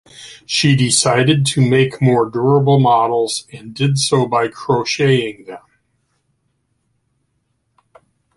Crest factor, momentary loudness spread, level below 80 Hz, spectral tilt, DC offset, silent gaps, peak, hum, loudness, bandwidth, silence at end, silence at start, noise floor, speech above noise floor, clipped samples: 16 dB; 13 LU; -54 dBFS; -5 dB/octave; under 0.1%; none; -2 dBFS; none; -15 LUFS; 11.5 kHz; 2.8 s; 0.2 s; -67 dBFS; 52 dB; under 0.1%